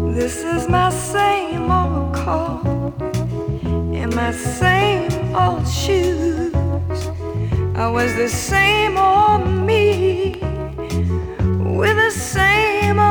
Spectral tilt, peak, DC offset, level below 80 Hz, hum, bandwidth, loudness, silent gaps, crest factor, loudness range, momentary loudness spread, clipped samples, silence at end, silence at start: -5.5 dB/octave; -2 dBFS; under 0.1%; -32 dBFS; none; over 20 kHz; -18 LUFS; none; 16 dB; 4 LU; 9 LU; under 0.1%; 0 s; 0 s